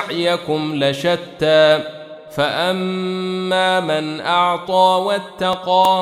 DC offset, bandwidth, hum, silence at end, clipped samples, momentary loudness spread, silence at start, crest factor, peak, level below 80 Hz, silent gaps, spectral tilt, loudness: under 0.1%; 16 kHz; none; 0 s; under 0.1%; 8 LU; 0 s; 14 dB; -2 dBFS; -58 dBFS; none; -5 dB/octave; -17 LUFS